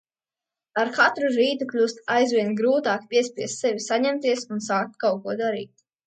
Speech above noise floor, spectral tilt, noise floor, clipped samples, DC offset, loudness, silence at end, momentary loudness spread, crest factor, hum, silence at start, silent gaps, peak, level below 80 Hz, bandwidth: over 67 dB; -3.5 dB/octave; under -90 dBFS; under 0.1%; under 0.1%; -23 LUFS; 0.4 s; 7 LU; 18 dB; none; 0.75 s; none; -6 dBFS; -76 dBFS; 9.2 kHz